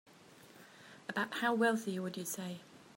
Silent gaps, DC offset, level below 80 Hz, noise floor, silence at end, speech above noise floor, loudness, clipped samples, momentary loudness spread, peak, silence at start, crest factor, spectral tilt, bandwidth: none; under 0.1%; -88 dBFS; -59 dBFS; 0.05 s; 24 dB; -36 LUFS; under 0.1%; 24 LU; -20 dBFS; 0.3 s; 20 dB; -4 dB/octave; 16.5 kHz